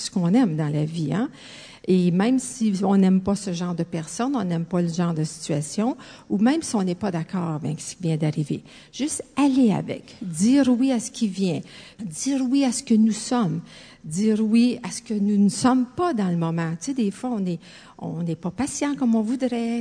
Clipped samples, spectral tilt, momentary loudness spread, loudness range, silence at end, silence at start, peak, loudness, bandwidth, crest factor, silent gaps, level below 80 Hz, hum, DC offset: under 0.1%; -6 dB/octave; 12 LU; 3 LU; 0 s; 0 s; -6 dBFS; -23 LUFS; 10 kHz; 18 dB; none; -60 dBFS; none; under 0.1%